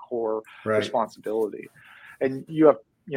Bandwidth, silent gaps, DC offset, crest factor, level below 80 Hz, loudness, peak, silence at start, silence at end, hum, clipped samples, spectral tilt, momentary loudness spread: 15 kHz; none; under 0.1%; 22 dB; -72 dBFS; -25 LUFS; -4 dBFS; 0 s; 0 s; none; under 0.1%; -6.5 dB/octave; 11 LU